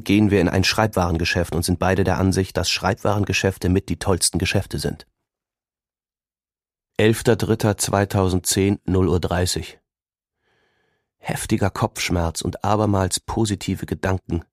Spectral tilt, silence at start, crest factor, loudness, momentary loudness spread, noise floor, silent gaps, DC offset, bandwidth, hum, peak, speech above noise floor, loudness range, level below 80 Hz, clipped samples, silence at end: -5 dB/octave; 0 s; 20 dB; -21 LUFS; 8 LU; under -90 dBFS; none; under 0.1%; 15.5 kHz; none; 0 dBFS; over 70 dB; 5 LU; -40 dBFS; under 0.1%; 0.1 s